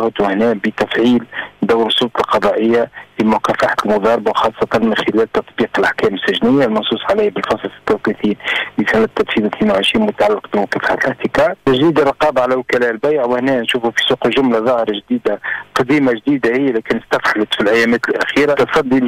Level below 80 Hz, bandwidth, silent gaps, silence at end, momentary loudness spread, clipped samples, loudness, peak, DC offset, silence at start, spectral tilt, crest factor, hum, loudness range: -48 dBFS; 15.5 kHz; none; 0 s; 5 LU; under 0.1%; -15 LUFS; -6 dBFS; under 0.1%; 0 s; -5.5 dB/octave; 8 dB; none; 1 LU